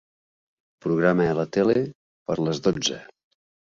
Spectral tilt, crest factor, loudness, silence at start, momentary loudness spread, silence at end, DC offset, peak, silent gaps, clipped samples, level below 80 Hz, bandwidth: -5 dB/octave; 20 dB; -24 LUFS; 0.85 s; 13 LU; 0.65 s; under 0.1%; -6 dBFS; 1.95-2.25 s; under 0.1%; -58 dBFS; 7.8 kHz